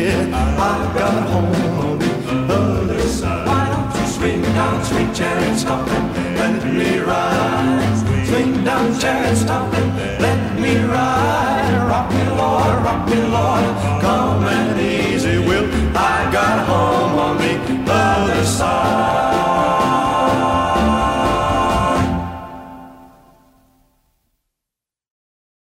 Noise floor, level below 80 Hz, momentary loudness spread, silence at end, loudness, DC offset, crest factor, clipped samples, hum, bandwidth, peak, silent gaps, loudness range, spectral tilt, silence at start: -85 dBFS; -32 dBFS; 3 LU; 2.7 s; -17 LUFS; under 0.1%; 14 dB; under 0.1%; none; 16 kHz; -4 dBFS; none; 2 LU; -5.5 dB/octave; 0 s